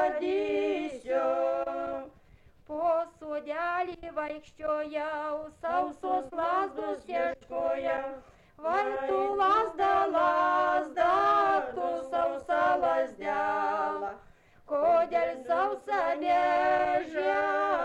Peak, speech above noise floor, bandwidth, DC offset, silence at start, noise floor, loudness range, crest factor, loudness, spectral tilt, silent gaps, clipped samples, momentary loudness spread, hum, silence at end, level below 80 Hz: -14 dBFS; 29 dB; 9.6 kHz; under 0.1%; 0 s; -57 dBFS; 7 LU; 14 dB; -29 LUFS; -5 dB/octave; none; under 0.1%; 10 LU; none; 0 s; -62 dBFS